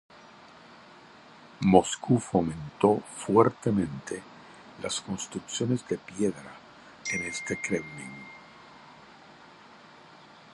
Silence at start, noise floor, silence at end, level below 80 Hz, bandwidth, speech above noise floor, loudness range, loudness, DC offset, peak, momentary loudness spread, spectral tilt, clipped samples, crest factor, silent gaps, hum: 0.7 s; -52 dBFS; 1.75 s; -58 dBFS; 11.5 kHz; 25 dB; 10 LU; -28 LUFS; under 0.1%; -2 dBFS; 26 LU; -5.5 dB/octave; under 0.1%; 28 dB; none; none